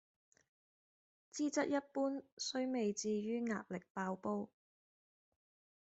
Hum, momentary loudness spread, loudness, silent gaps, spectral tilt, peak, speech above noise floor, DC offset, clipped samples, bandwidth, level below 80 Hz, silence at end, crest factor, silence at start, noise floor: none; 6 LU; -40 LUFS; 2.32-2.37 s, 3.90-3.95 s; -4.5 dB/octave; -24 dBFS; over 50 dB; under 0.1%; under 0.1%; 8.2 kHz; -86 dBFS; 1.4 s; 18 dB; 1.35 s; under -90 dBFS